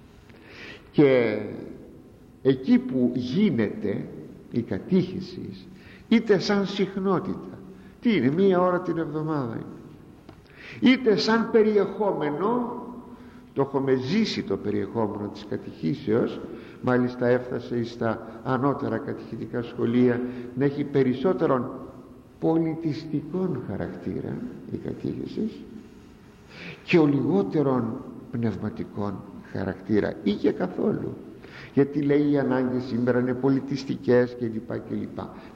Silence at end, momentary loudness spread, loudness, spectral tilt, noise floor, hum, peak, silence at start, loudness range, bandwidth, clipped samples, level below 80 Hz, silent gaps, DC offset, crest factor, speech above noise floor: 0 s; 18 LU; -25 LUFS; -7.5 dB/octave; -49 dBFS; none; -8 dBFS; 0.05 s; 4 LU; 7.6 kHz; under 0.1%; -58 dBFS; none; under 0.1%; 18 dB; 24 dB